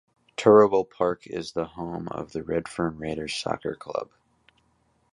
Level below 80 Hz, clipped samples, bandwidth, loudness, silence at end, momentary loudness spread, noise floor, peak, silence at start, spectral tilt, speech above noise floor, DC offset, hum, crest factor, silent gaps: -56 dBFS; under 0.1%; 11 kHz; -25 LUFS; 1.1 s; 16 LU; -67 dBFS; -4 dBFS; 0.4 s; -5.5 dB/octave; 43 dB; under 0.1%; none; 22 dB; none